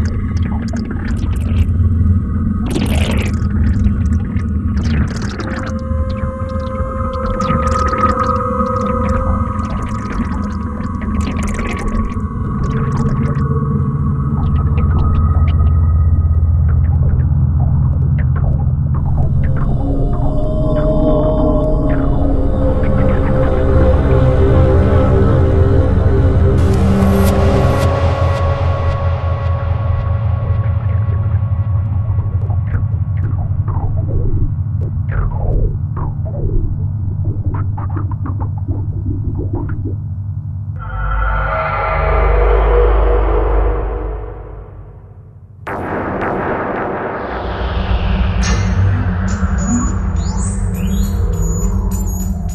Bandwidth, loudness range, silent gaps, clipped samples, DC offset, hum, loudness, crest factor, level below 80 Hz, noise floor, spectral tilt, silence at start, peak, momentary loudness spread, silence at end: 12.5 kHz; 7 LU; none; under 0.1%; under 0.1%; none; -16 LUFS; 14 dB; -18 dBFS; -36 dBFS; -7.5 dB/octave; 0 s; 0 dBFS; 8 LU; 0 s